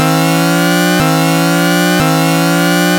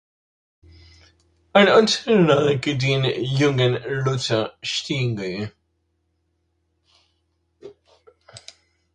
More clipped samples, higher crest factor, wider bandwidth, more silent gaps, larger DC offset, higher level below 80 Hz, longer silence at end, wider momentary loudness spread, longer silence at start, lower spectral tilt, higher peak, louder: neither; second, 10 dB vs 22 dB; first, 17 kHz vs 10 kHz; neither; neither; first, -42 dBFS vs -56 dBFS; second, 0 s vs 0.55 s; second, 0 LU vs 11 LU; second, 0 s vs 1.55 s; about the same, -4.5 dB/octave vs -5.5 dB/octave; about the same, 0 dBFS vs 0 dBFS; first, -11 LUFS vs -20 LUFS